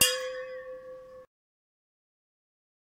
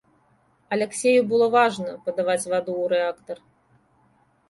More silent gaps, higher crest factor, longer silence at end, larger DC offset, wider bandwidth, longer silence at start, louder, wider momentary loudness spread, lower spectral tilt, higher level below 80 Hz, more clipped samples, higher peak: neither; first, 30 dB vs 18 dB; first, 1.75 s vs 1.15 s; neither; first, 16 kHz vs 11.5 kHz; second, 0 s vs 0.7 s; second, -32 LUFS vs -22 LUFS; first, 21 LU vs 12 LU; second, 0.5 dB/octave vs -4 dB/octave; about the same, -70 dBFS vs -68 dBFS; neither; about the same, -6 dBFS vs -6 dBFS